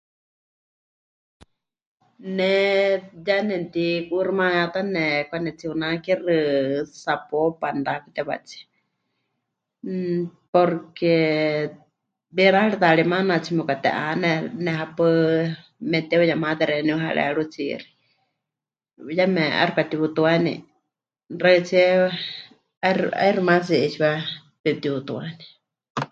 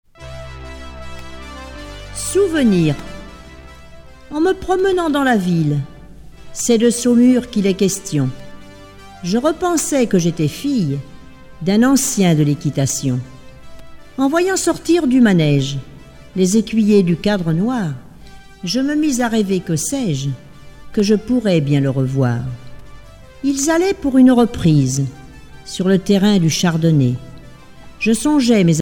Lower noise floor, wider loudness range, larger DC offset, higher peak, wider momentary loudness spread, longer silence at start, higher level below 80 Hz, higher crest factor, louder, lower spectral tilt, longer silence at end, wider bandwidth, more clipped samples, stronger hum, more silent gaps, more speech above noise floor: first, -88 dBFS vs -38 dBFS; about the same, 5 LU vs 4 LU; neither; about the same, -2 dBFS vs -2 dBFS; second, 12 LU vs 20 LU; first, 2.2 s vs 0.2 s; second, -66 dBFS vs -42 dBFS; first, 22 dB vs 14 dB; second, -22 LUFS vs -16 LUFS; about the same, -6.5 dB/octave vs -5.5 dB/octave; about the same, 0.05 s vs 0 s; second, 7.8 kHz vs 17.5 kHz; neither; neither; first, 10.48-10.53 s, 22.77-22.81 s, 24.60-24.64 s, 25.90-25.95 s vs none; first, 67 dB vs 23 dB